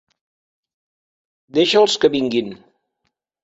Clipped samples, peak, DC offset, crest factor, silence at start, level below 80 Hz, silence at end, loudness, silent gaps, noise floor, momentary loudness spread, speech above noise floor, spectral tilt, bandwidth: under 0.1%; 0 dBFS; under 0.1%; 20 dB; 1.55 s; -62 dBFS; 0.9 s; -17 LUFS; none; -74 dBFS; 9 LU; 57 dB; -4 dB/octave; 8 kHz